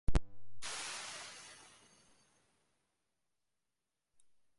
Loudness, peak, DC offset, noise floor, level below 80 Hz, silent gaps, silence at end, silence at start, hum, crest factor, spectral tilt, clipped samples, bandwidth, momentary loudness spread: -44 LUFS; -20 dBFS; under 0.1%; under -90 dBFS; -46 dBFS; none; 3.05 s; 0.1 s; none; 20 dB; -3.5 dB/octave; under 0.1%; 11.5 kHz; 20 LU